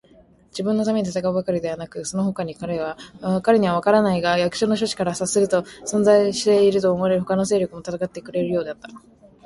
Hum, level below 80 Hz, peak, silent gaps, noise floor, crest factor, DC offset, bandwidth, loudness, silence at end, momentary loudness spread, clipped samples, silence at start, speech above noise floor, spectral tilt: none; -56 dBFS; -4 dBFS; none; -53 dBFS; 18 dB; under 0.1%; 11.5 kHz; -21 LUFS; 0.45 s; 12 LU; under 0.1%; 0.55 s; 32 dB; -5 dB/octave